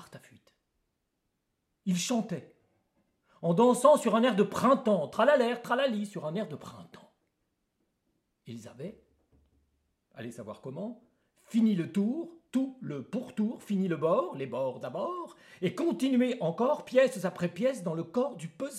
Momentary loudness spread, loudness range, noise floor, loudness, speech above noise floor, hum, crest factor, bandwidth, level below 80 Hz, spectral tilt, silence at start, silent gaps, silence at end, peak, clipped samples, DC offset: 18 LU; 19 LU; -81 dBFS; -29 LUFS; 52 dB; none; 22 dB; 14.5 kHz; -78 dBFS; -6 dB/octave; 0 s; none; 0 s; -8 dBFS; under 0.1%; under 0.1%